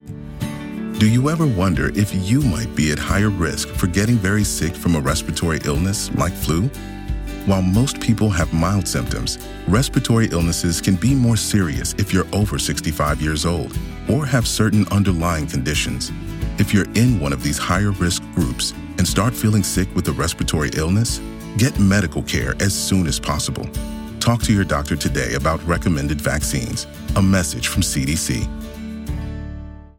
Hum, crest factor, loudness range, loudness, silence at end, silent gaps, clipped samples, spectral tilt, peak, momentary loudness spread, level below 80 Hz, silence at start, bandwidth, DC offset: none; 14 dB; 2 LU; -19 LUFS; 0.15 s; none; under 0.1%; -5 dB/octave; -4 dBFS; 10 LU; -30 dBFS; 0.05 s; 17 kHz; under 0.1%